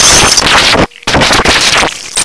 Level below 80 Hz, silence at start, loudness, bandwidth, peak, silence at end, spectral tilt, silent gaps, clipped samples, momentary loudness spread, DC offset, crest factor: -24 dBFS; 0 s; -5 LUFS; 11 kHz; 0 dBFS; 0 s; -1.5 dB/octave; none; 2%; 6 LU; under 0.1%; 8 dB